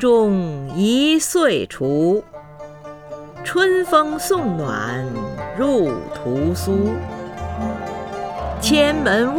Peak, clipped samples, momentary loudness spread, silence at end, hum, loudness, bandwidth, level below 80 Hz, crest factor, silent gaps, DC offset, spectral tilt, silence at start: -2 dBFS; under 0.1%; 15 LU; 0 s; none; -19 LUFS; 20 kHz; -40 dBFS; 18 dB; none; under 0.1%; -5 dB/octave; 0 s